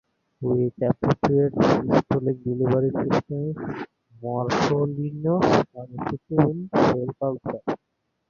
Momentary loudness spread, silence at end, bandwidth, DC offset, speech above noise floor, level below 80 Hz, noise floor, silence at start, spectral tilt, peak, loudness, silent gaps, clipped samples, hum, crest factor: 12 LU; 0.55 s; 7.2 kHz; under 0.1%; 53 dB; -52 dBFS; -76 dBFS; 0.4 s; -7.5 dB/octave; -2 dBFS; -24 LUFS; none; under 0.1%; none; 22 dB